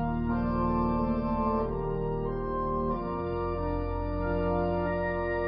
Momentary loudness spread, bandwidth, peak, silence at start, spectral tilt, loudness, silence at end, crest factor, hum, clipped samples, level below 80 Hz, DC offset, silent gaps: 4 LU; 5.2 kHz; -16 dBFS; 0 s; -12 dB/octave; -30 LUFS; 0 s; 12 dB; none; under 0.1%; -38 dBFS; under 0.1%; none